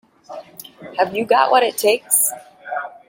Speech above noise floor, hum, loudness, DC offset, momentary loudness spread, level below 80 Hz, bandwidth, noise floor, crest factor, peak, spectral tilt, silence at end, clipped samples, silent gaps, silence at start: 22 dB; none; -17 LUFS; under 0.1%; 22 LU; -70 dBFS; 17 kHz; -39 dBFS; 18 dB; 0 dBFS; -1 dB/octave; 0.2 s; under 0.1%; none; 0.3 s